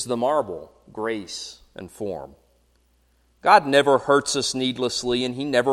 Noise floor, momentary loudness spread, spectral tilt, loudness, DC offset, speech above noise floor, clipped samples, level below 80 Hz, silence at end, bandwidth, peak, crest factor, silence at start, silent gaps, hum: -63 dBFS; 20 LU; -3.5 dB/octave; -21 LUFS; under 0.1%; 41 dB; under 0.1%; -58 dBFS; 0 s; 15 kHz; -2 dBFS; 22 dB; 0 s; none; none